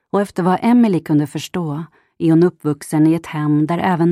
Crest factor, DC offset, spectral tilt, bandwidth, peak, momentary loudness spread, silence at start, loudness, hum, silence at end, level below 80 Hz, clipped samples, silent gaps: 14 dB; under 0.1%; -7.5 dB/octave; 13.5 kHz; -2 dBFS; 10 LU; 0.15 s; -17 LUFS; none; 0 s; -58 dBFS; under 0.1%; none